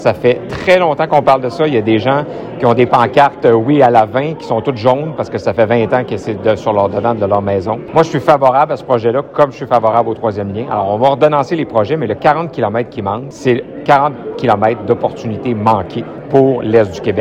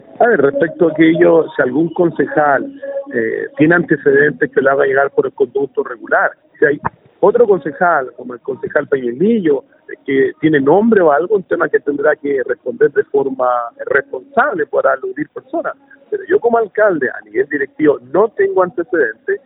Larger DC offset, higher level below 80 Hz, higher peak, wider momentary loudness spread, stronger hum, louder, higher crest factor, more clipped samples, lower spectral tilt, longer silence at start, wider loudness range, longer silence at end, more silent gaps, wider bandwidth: neither; first, -48 dBFS vs -60 dBFS; about the same, 0 dBFS vs 0 dBFS; about the same, 8 LU vs 10 LU; neither; about the same, -13 LUFS vs -14 LUFS; about the same, 12 dB vs 14 dB; first, 0.2% vs under 0.1%; second, -7.5 dB/octave vs -12 dB/octave; second, 0 s vs 0.2 s; about the same, 3 LU vs 3 LU; about the same, 0 s vs 0.1 s; neither; first, 10 kHz vs 3.9 kHz